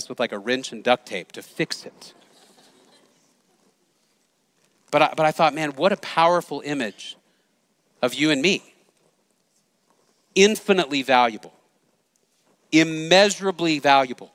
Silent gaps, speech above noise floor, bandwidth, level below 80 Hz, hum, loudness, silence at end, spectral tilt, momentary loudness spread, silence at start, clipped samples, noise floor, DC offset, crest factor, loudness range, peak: none; 46 dB; 16 kHz; -70 dBFS; none; -21 LUFS; 0.1 s; -3.5 dB/octave; 13 LU; 0 s; under 0.1%; -67 dBFS; under 0.1%; 24 dB; 9 LU; 0 dBFS